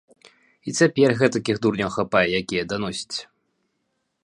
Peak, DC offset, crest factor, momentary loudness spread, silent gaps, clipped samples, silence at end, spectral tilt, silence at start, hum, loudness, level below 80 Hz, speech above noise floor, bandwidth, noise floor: -2 dBFS; under 0.1%; 20 dB; 12 LU; none; under 0.1%; 1 s; -5 dB/octave; 0.65 s; none; -22 LUFS; -56 dBFS; 53 dB; 11 kHz; -74 dBFS